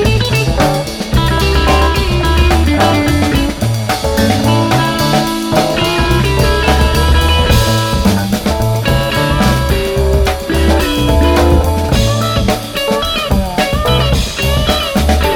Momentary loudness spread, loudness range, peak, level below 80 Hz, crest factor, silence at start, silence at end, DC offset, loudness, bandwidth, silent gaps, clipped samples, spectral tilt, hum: 4 LU; 1 LU; 0 dBFS; -16 dBFS; 12 dB; 0 s; 0 s; under 0.1%; -12 LUFS; 18 kHz; none; under 0.1%; -5 dB/octave; none